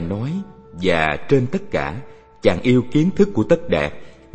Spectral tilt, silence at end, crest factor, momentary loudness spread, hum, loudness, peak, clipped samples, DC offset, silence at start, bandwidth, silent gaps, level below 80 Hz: -7 dB/octave; 0.2 s; 18 dB; 11 LU; none; -19 LUFS; 0 dBFS; under 0.1%; under 0.1%; 0 s; 8.6 kHz; none; -42 dBFS